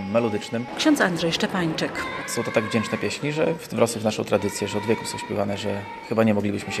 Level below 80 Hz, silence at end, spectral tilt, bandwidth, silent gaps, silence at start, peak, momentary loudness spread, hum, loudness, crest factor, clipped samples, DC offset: -58 dBFS; 0 s; -4.5 dB/octave; 15 kHz; none; 0 s; -4 dBFS; 7 LU; none; -24 LUFS; 20 dB; under 0.1%; under 0.1%